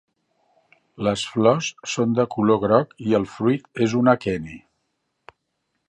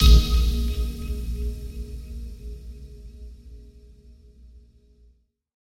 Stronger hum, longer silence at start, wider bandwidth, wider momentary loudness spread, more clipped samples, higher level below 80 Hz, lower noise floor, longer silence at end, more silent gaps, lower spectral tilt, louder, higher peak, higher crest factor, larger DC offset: neither; first, 1 s vs 0 s; second, 10 kHz vs 16 kHz; second, 8 LU vs 23 LU; neither; second, -56 dBFS vs -24 dBFS; first, -75 dBFS vs -60 dBFS; second, 1.3 s vs 1.95 s; neither; about the same, -6 dB/octave vs -5.5 dB/octave; first, -21 LUFS vs -26 LUFS; about the same, -2 dBFS vs -4 dBFS; about the same, 20 dB vs 22 dB; neither